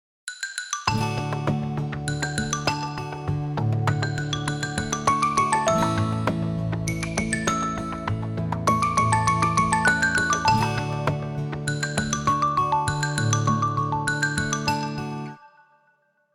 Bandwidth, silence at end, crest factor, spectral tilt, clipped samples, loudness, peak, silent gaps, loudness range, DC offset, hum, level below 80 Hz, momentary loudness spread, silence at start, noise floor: 15 kHz; 0.85 s; 20 dB; -4.5 dB/octave; under 0.1%; -24 LUFS; -4 dBFS; none; 5 LU; under 0.1%; none; -46 dBFS; 8 LU; 0.25 s; -65 dBFS